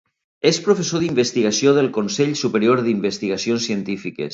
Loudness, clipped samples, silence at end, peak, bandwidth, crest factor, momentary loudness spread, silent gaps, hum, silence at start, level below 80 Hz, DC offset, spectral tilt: -19 LUFS; under 0.1%; 0 s; -2 dBFS; 8 kHz; 18 dB; 7 LU; none; none; 0.45 s; -60 dBFS; under 0.1%; -4.5 dB/octave